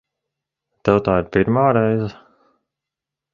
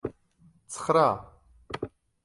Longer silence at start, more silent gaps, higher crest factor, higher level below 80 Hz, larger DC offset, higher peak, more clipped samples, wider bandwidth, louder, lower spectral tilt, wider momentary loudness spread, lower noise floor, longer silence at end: first, 0.85 s vs 0.05 s; neither; about the same, 20 dB vs 20 dB; first, -46 dBFS vs -58 dBFS; neither; first, -2 dBFS vs -10 dBFS; neither; second, 7.2 kHz vs 11.5 kHz; first, -18 LUFS vs -27 LUFS; first, -9 dB/octave vs -5 dB/octave; second, 8 LU vs 18 LU; first, -85 dBFS vs -61 dBFS; first, 1.2 s vs 0.35 s